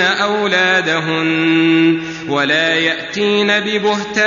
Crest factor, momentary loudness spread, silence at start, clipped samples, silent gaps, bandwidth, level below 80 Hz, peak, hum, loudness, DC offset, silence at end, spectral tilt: 12 dB; 5 LU; 0 s; under 0.1%; none; 7.4 kHz; -56 dBFS; -2 dBFS; none; -14 LUFS; under 0.1%; 0 s; -4.5 dB/octave